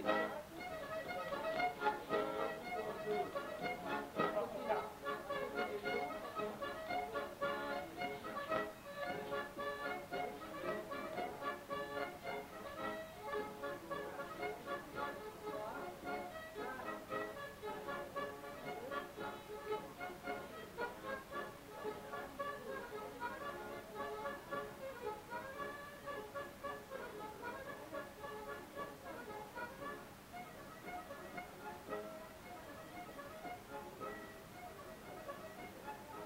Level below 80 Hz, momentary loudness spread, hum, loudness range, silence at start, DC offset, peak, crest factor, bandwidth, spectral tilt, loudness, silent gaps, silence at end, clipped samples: -70 dBFS; 10 LU; none; 9 LU; 0 s; under 0.1%; -20 dBFS; 24 dB; 16 kHz; -4.5 dB/octave; -45 LUFS; none; 0 s; under 0.1%